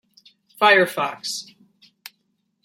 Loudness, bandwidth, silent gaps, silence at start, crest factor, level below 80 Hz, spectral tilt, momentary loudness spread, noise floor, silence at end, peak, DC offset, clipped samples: -19 LUFS; 16 kHz; none; 0.6 s; 22 dB; -78 dBFS; -2.5 dB/octave; 14 LU; -71 dBFS; 1.2 s; -2 dBFS; under 0.1%; under 0.1%